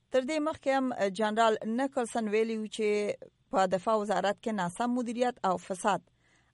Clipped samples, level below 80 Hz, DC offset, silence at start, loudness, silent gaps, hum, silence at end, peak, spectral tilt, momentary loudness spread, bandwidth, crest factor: under 0.1%; -70 dBFS; under 0.1%; 0.1 s; -30 LUFS; none; none; 0.55 s; -12 dBFS; -5 dB/octave; 5 LU; 11.5 kHz; 18 dB